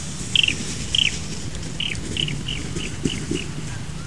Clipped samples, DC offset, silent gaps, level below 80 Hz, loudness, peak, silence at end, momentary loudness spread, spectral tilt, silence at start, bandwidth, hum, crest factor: under 0.1%; 2%; none; -38 dBFS; -23 LUFS; -2 dBFS; 0 s; 13 LU; -3 dB/octave; 0 s; 12 kHz; none; 24 dB